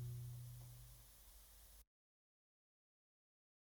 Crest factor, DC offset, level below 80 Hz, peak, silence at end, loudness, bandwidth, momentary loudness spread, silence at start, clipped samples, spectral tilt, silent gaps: 16 dB; under 0.1%; -68 dBFS; -42 dBFS; 1.85 s; -57 LUFS; over 20 kHz; 12 LU; 0 s; under 0.1%; -5 dB/octave; none